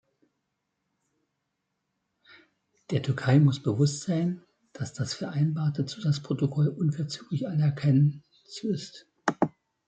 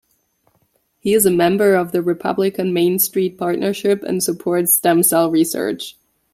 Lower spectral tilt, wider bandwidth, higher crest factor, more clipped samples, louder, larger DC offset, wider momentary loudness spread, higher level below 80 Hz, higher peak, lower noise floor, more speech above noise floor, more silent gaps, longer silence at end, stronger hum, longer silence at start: first, -7 dB/octave vs -4.5 dB/octave; second, 9 kHz vs 16.5 kHz; first, 24 dB vs 16 dB; neither; second, -28 LUFS vs -17 LUFS; neither; first, 12 LU vs 7 LU; second, -68 dBFS vs -60 dBFS; second, -4 dBFS vs 0 dBFS; first, -81 dBFS vs -63 dBFS; first, 55 dB vs 47 dB; neither; about the same, 0.4 s vs 0.4 s; neither; first, 2.9 s vs 1.05 s